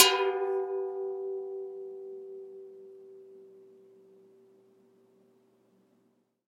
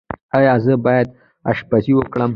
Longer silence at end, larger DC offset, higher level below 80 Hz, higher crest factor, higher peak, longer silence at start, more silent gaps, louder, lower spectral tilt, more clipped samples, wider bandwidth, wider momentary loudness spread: first, 2.85 s vs 0 s; neither; second, under -90 dBFS vs -48 dBFS; first, 30 dB vs 14 dB; about the same, -4 dBFS vs -2 dBFS; about the same, 0 s vs 0.1 s; second, none vs 0.22-0.29 s; second, -32 LUFS vs -16 LUFS; second, 0 dB/octave vs -10 dB/octave; neither; first, 16 kHz vs 5.4 kHz; first, 23 LU vs 9 LU